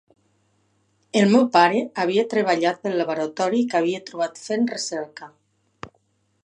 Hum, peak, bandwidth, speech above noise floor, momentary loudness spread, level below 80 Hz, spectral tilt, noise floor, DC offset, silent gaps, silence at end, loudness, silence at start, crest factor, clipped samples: none; -2 dBFS; 10 kHz; 46 dB; 21 LU; -70 dBFS; -5 dB/octave; -67 dBFS; under 0.1%; none; 0.55 s; -21 LUFS; 1.15 s; 22 dB; under 0.1%